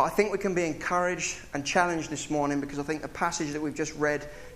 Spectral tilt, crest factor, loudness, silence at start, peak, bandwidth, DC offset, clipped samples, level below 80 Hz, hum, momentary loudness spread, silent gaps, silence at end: -4 dB/octave; 20 dB; -29 LUFS; 0 s; -8 dBFS; 15.5 kHz; under 0.1%; under 0.1%; -52 dBFS; none; 7 LU; none; 0 s